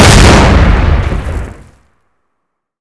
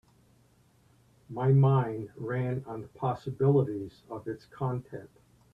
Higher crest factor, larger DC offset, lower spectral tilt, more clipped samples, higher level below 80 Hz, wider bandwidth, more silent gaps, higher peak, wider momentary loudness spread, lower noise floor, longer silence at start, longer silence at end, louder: second, 8 dB vs 18 dB; neither; second, -5 dB/octave vs -10 dB/octave; first, 7% vs under 0.1%; first, -12 dBFS vs -64 dBFS; first, 11 kHz vs 4.8 kHz; neither; first, 0 dBFS vs -12 dBFS; about the same, 18 LU vs 18 LU; first, -69 dBFS vs -64 dBFS; second, 0 s vs 1.3 s; first, 1.3 s vs 0.5 s; first, -7 LUFS vs -29 LUFS